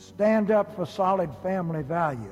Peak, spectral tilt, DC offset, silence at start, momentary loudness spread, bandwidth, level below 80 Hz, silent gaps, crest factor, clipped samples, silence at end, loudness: -12 dBFS; -8 dB/octave; under 0.1%; 0 s; 7 LU; 13.5 kHz; -58 dBFS; none; 14 dB; under 0.1%; 0 s; -26 LUFS